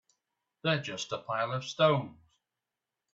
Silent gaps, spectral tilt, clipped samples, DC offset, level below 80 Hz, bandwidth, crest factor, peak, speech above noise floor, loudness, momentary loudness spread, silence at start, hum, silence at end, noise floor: none; -5 dB/octave; under 0.1%; under 0.1%; -74 dBFS; 7.8 kHz; 22 dB; -12 dBFS; 58 dB; -31 LUFS; 10 LU; 0.65 s; none; 1 s; -89 dBFS